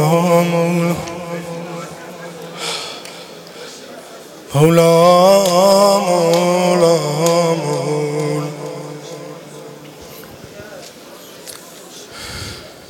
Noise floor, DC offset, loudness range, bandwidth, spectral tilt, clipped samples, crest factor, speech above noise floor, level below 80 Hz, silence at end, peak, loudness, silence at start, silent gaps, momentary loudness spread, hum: -37 dBFS; under 0.1%; 20 LU; 17 kHz; -5 dB/octave; under 0.1%; 14 dB; 26 dB; -54 dBFS; 0.05 s; -2 dBFS; -14 LUFS; 0 s; none; 24 LU; none